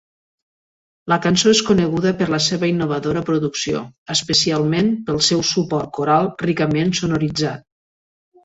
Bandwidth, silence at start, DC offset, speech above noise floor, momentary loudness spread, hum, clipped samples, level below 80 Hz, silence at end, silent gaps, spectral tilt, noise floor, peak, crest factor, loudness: 8 kHz; 1.05 s; under 0.1%; over 72 dB; 8 LU; none; under 0.1%; -50 dBFS; 0.85 s; 3.98-4.06 s; -4.5 dB/octave; under -90 dBFS; -2 dBFS; 16 dB; -18 LUFS